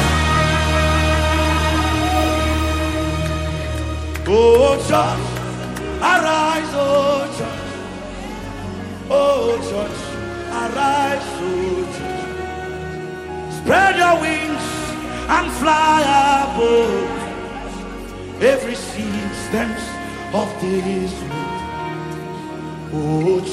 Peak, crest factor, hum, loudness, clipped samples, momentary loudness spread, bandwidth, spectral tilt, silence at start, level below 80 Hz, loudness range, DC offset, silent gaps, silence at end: -2 dBFS; 16 dB; none; -19 LUFS; under 0.1%; 15 LU; 15.5 kHz; -5 dB/octave; 0 s; -30 dBFS; 6 LU; under 0.1%; none; 0 s